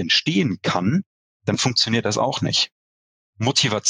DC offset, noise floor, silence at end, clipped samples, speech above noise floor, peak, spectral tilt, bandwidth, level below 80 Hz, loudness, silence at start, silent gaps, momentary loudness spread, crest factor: under 0.1%; under -90 dBFS; 0 s; under 0.1%; over 70 dB; -4 dBFS; -3.5 dB/octave; 10.5 kHz; -62 dBFS; -20 LUFS; 0 s; 1.06-1.40 s, 2.72-3.33 s; 8 LU; 16 dB